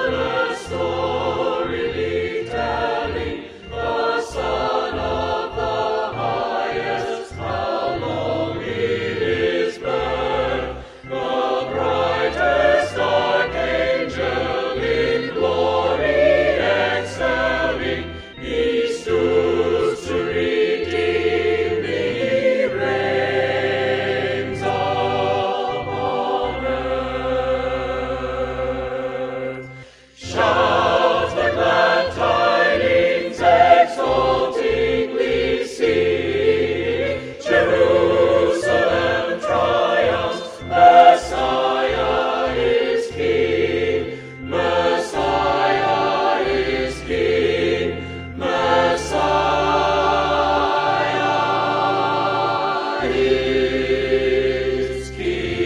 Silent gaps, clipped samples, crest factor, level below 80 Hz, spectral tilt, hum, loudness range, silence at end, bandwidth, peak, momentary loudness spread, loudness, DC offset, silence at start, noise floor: none; under 0.1%; 18 dB; -40 dBFS; -5 dB/octave; none; 7 LU; 0 s; 11 kHz; 0 dBFS; 8 LU; -19 LUFS; under 0.1%; 0 s; -41 dBFS